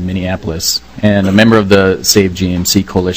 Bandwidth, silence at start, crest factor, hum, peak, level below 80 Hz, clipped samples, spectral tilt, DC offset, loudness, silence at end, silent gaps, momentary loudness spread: 20 kHz; 0 s; 12 dB; none; 0 dBFS; -36 dBFS; 1%; -4.5 dB/octave; 1%; -11 LUFS; 0 s; none; 8 LU